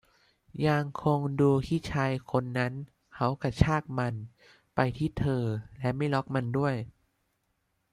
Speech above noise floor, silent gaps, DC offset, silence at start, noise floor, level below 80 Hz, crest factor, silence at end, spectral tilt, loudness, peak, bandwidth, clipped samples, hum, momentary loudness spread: 48 dB; none; under 0.1%; 0.55 s; -76 dBFS; -48 dBFS; 24 dB; 1 s; -7.5 dB/octave; -30 LUFS; -6 dBFS; 11.5 kHz; under 0.1%; none; 11 LU